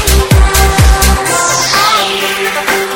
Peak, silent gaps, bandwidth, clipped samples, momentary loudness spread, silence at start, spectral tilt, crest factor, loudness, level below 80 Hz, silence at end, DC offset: 0 dBFS; none; 17.5 kHz; 0.4%; 4 LU; 0 s; -3 dB/octave; 10 dB; -9 LUFS; -14 dBFS; 0 s; under 0.1%